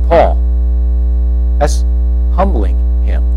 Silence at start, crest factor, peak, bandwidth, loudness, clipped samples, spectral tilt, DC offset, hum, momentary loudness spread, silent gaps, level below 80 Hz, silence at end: 0 s; 10 dB; 0 dBFS; 9.8 kHz; -13 LUFS; under 0.1%; -7.5 dB/octave; under 0.1%; 60 Hz at -10 dBFS; 3 LU; none; -10 dBFS; 0 s